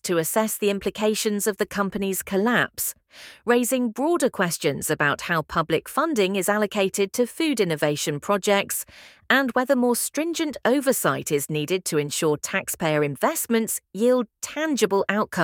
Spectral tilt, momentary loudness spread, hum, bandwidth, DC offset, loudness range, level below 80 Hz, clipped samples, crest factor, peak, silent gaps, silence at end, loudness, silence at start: -4 dB/octave; 5 LU; none; 18 kHz; under 0.1%; 1 LU; -60 dBFS; under 0.1%; 20 dB; -4 dBFS; none; 0 s; -23 LUFS; 0.05 s